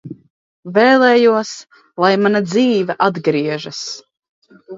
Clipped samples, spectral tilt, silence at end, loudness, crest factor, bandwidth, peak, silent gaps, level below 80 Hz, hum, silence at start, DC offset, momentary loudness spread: under 0.1%; -5 dB/octave; 0 s; -15 LUFS; 16 dB; 7.8 kHz; 0 dBFS; 0.30-0.63 s, 4.19-4.23 s, 4.29-4.42 s; -66 dBFS; none; 0.05 s; under 0.1%; 19 LU